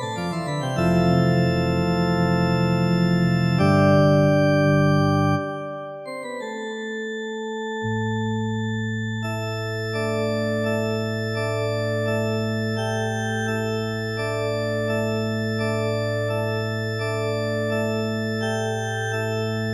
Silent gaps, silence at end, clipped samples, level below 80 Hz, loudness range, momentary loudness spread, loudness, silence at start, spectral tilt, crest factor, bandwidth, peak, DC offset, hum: none; 0 s; under 0.1%; -48 dBFS; 8 LU; 11 LU; -23 LUFS; 0 s; -6.5 dB/octave; 18 dB; 13.5 kHz; -6 dBFS; under 0.1%; none